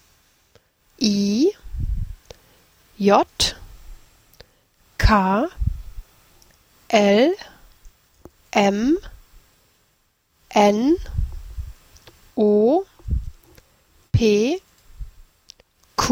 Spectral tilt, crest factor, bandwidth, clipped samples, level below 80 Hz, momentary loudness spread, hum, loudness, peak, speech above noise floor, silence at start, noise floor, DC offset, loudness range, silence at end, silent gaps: -5.5 dB/octave; 22 dB; 16.5 kHz; under 0.1%; -34 dBFS; 21 LU; none; -20 LUFS; -2 dBFS; 48 dB; 1 s; -65 dBFS; under 0.1%; 4 LU; 0 s; none